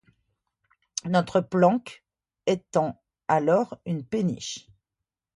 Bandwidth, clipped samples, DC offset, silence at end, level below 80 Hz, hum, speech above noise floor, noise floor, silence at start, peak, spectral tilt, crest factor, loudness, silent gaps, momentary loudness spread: 11.5 kHz; under 0.1%; under 0.1%; 0.75 s; -66 dBFS; none; 63 dB; -87 dBFS; 0.95 s; -6 dBFS; -6 dB/octave; 20 dB; -26 LUFS; none; 14 LU